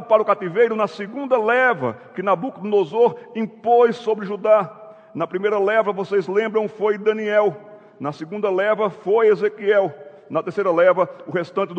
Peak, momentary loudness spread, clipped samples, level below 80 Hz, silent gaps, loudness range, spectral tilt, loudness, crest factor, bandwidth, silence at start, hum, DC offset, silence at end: -2 dBFS; 11 LU; under 0.1%; -76 dBFS; none; 2 LU; -7 dB/octave; -20 LUFS; 18 dB; 7.8 kHz; 0 s; none; under 0.1%; 0 s